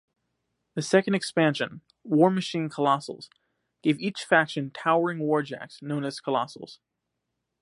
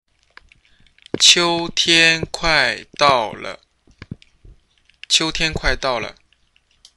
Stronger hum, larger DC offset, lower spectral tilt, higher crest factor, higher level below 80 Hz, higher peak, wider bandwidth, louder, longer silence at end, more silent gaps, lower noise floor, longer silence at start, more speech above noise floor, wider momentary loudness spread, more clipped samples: neither; neither; first, -5.5 dB/octave vs -1.5 dB/octave; about the same, 22 dB vs 20 dB; second, -74 dBFS vs -38 dBFS; second, -6 dBFS vs 0 dBFS; about the same, 11.5 kHz vs 12.5 kHz; second, -26 LUFS vs -15 LUFS; about the same, 0.9 s vs 0.85 s; neither; first, -82 dBFS vs -60 dBFS; second, 0.75 s vs 1.15 s; first, 56 dB vs 42 dB; about the same, 14 LU vs 16 LU; neither